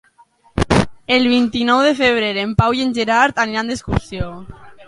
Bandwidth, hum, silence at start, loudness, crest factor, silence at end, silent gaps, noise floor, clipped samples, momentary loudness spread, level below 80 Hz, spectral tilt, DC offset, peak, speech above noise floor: 11.5 kHz; none; 0.55 s; -16 LUFS; 16 dB; 0.05 s; none; -52 dBFS; under 0.1%; 13 LU; -34 dBFS; -5.5 dB/octave; under 0.1%; 0 dBFS; 36 dB